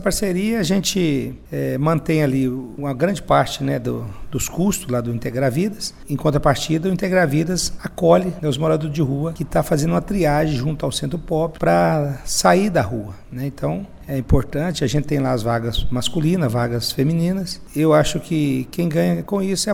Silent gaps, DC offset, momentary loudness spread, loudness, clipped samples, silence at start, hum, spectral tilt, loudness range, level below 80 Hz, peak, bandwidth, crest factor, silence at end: none; under 0.1%; 9 LU; -20 LUFS; under 0.1%; 0 s; none; -5.5 dB/octave; 3 LU; -34 dBFS; 0 dBFS; 17 kHz; 20 dB; 0 s